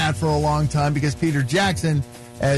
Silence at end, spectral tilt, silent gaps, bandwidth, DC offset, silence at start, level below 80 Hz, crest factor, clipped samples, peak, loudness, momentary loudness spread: 0 s; -5.5 dB/octave; none; 12.5 kHz; under 0.1%; 0 s; -38 dBFS; 10 dB; under 0.1%; -10 dBFS; -21 LUFS; 5 LU